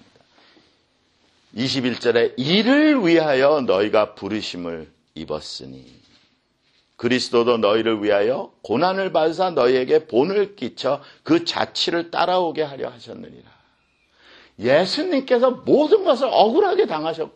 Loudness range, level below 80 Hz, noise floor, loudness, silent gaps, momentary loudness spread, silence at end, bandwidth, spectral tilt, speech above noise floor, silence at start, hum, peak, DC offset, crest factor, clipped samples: 6 LU; -62 dBFS; -64 dBFS; -19 LUFS; none; 14 LU; 0.05 s; 9.4 kHz; -5 dB/octave; 44 dB; 1.55 s; none; -2 dBFS; under 0.1%; 18 dB; under 0.1%